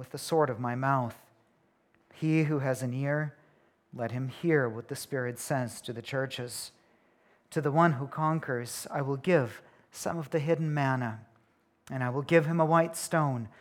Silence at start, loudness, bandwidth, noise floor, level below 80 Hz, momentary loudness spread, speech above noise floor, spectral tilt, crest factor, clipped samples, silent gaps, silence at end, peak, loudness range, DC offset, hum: 0 s; -30 LUFS; 17 kHz; -69 dBFS; -74 dBFS; 13 LU; 40 dB; -6 dB/octave; 22 dB; under 0.1%; none; 0.1 s; -10 dBFS; 4 LU; under 0.1%; none